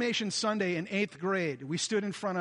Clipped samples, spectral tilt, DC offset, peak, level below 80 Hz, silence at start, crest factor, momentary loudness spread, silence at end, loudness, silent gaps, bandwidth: under 0.1%; -4 dB/octave; under 0.1%; -16 dBFS; -76 dBFS; 0 s; 14 dB; 4 LU; 0 s; -31 LUFS; none; 11.5 kHz